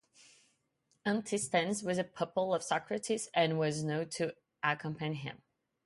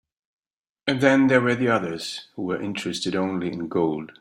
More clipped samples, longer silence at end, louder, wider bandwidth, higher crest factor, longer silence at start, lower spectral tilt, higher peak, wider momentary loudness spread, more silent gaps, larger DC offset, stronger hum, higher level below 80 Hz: neither; first, 0.5 s vs 0.1 s; second, -34 LUFS vs -23 LUFS; second, 11.5 kHz vs 13 kHz; about the same, 20 dB vs 20 dB; first, 1.05 s vs 0.85 s; about the same, -4.5 dB/octave vs -5.5 dB/octave; second, -14 dBFS vs -4 dBFS; second, 7 LU vs 12 LU; neither; neither; neither; second, -76 dBFS vs -62 dBFS